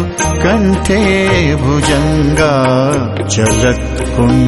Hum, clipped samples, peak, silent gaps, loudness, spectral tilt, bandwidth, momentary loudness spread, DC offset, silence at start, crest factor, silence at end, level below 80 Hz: none; under 0.1%; 0 dBFS; none; -12 LUFS; -5.5 dB/octave; 12 kHz; 4 LU; under 0.1%; 0 s; 10 dB; 0 s; -22 dBFS